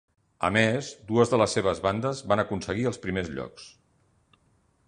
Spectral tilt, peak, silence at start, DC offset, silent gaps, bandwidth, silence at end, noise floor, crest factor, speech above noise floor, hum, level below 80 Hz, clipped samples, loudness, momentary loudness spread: -5 dB/octave; -6 dBFS; 0.4 s; under 0.1%; none; 10.5 kHz; 1.2 s; -66 dBFS; 22 dB; 40 dB; none; -52 dBFS; under 0.1%; -26 LUFS; 11 LU